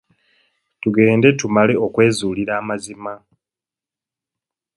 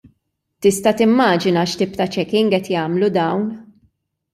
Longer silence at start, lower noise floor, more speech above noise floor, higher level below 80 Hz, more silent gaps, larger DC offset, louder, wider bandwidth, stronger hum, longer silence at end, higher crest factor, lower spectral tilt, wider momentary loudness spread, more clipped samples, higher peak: first, 0.85 s vs 0.6 s; first, -89 dBFS vs -70 dBFS; first, 73 dB vs 54 dB; about the same, -56 dBFS vs -58 dBFS; neither; neither; about the same, -17 LUFS vs -17 LUFS; second, 11.5 kHz vs 14.5 kHz; neither; first, 1.6 s vs 0.7 s; about the same, 20 dB vs 16 dB; about the same, -6 dB/octave vs -5.5 dB/octave; first, 17 LU vs 7 LU; neither; about the same, 0 dBFS vs -2 dBFS